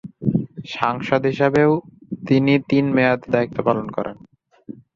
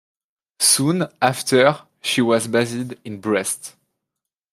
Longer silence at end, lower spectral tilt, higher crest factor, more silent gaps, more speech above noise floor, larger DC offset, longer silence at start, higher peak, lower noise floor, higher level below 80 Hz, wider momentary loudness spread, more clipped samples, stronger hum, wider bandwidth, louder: second, 0.25 s vs 0.85 s; first, -8 dB/octave vs -3.5 dB/octave; about the same, 18 dB vs 20 dB; neither; second, 33 dB vs 64 dB; neither; second, 0.05 s vs 0.6 s; about the same, -2 dBFS vs -2 dBFS; second, -51 dBFS vs -83 dBFS; first, -56 dBFS vs -66 dBFS; about the same, 15 LU vs 14 LU; neither; neither; second, 7.2 kHz vs 15.5 kHz; about the same, -19 LUFS vs -19 LUFS